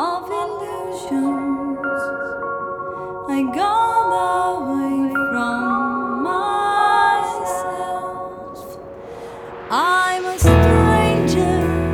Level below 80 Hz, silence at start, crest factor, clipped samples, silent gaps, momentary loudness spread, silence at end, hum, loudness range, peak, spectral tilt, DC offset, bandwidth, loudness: -32 dBFS; 0 s; 18 dB; under 0.1%; none; 16 LU; 0 s; none; 5 LU; 0 dBFS; -6 dB/octave; under 0.1%; 17 kHz; -19 LUFS